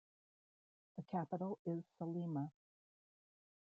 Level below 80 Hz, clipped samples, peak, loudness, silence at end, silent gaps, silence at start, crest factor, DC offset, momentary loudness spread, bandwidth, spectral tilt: -90 dBFS; under 0.1%; -28 dBFS; -45 LUFS; 1.25 s; 1.59-1.65 s; 0.95 s; 18 dB; under 0.1%; 8 LU; 5.2 kHz; -10 dB/octave